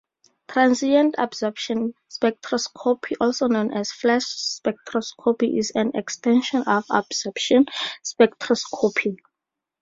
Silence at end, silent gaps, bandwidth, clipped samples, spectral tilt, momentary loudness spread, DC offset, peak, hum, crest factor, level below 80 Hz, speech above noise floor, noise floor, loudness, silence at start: 0.65 s; none; 7.8 kHz; under 0.1%; -3.5 dB/octave; 8 LU; under 0.1%; -2 dBFS; none; 20 dB; -66 dBFS; 63 dB; -85 dBFS; -22 LUFS; 0.5 s